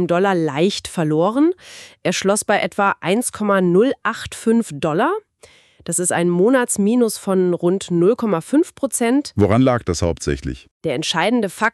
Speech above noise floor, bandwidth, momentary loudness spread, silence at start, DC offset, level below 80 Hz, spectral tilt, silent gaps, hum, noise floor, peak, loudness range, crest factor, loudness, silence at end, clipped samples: 32 dB; 13.5 kHz; 8 LU; 0 s; under 0.1%; -44 dBFS; -5 dB/octave; 10.71-10.80 s; none; -50 dBFS; -2 dBFS; 2 LU; 14 dB; -18 LUFS; 0 s; under 0.1%